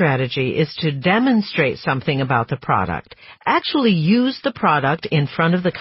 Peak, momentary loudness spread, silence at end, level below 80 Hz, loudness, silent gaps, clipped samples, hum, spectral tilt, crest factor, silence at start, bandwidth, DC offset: -4 dBFS; 5 LU; 0 s; -52 dBFS; -18 LUFS; none; under 0.1%; none; -4.5 dB/octave; 16 dB; 0 s; 5.8 kHz; under 0.1%